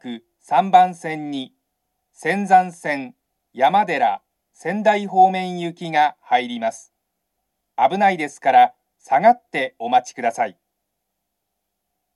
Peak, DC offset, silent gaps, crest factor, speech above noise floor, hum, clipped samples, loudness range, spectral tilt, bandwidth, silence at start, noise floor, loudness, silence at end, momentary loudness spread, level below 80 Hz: 0 dBFS; under 0.1%; none; 20 dB; 59 dB; none; under 0.1%; 3 LU; -5 dB/octave; 11.5 kHz; 0.05 s; -77 dBFS; -19 LUFS; 1.65 s; 13 LU; -78 dBFS